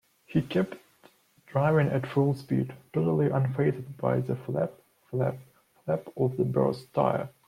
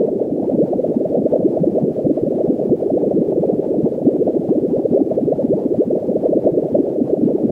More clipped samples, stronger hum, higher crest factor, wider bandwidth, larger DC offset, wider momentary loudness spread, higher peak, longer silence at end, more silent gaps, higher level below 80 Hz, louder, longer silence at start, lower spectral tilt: neither; neither; about the same, 18 dB vs 14 dB; first, 14.5 kHz vs 3 kHz; neither; first, 7 LU vs 2 LU; second, -12 dBFS vs -2 dBFS; first, 0.2 s vs 0 s; neither; second, -62 dBFS vs -54 dBFS; second, -28 LUFS vs -17 LUFS; first, 0.3 s vs 0 s; second, -9 dB/octave vs -12 dB/octave